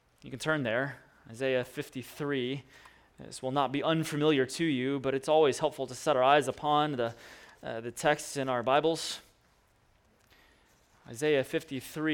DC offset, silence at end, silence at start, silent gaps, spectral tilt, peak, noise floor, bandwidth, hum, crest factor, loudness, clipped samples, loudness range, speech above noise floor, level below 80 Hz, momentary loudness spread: under 0.1%; 0 s; 0.25 s; none; -4.5 dB/octave; -10 dBFS; -67 dBFS; 18.5 kHz; none; 22 dB; -30 LUFS; under 0.1%; 7 LU; 37 dB; -68 dBFS; 15 LU